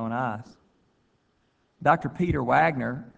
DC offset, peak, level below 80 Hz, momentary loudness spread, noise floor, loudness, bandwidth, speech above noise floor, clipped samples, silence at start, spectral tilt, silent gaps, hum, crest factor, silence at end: under 0.1%; -6 dBFS; -50 dBFS; 10 LU; -69 dBFS; -25 LUFS; 8 kHz; 44 dB; under 0.1%; 0 s; -8 dB/octave; none; none; 22 dB; 0.1 s